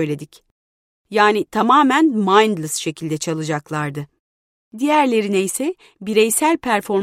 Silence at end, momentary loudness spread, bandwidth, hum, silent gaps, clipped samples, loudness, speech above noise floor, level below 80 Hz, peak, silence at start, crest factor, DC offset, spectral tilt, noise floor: 0 s; 11 LU; 16 kHz; none; 0.51-1.05 s, 4.19-4.71 s; under 0.1%; -17 LUFS; over 72 dB; -62 dBFS; 0 dBFS; 0 s; 18 dB; under 0.1%; -4 dB/octave; under -90 dBFS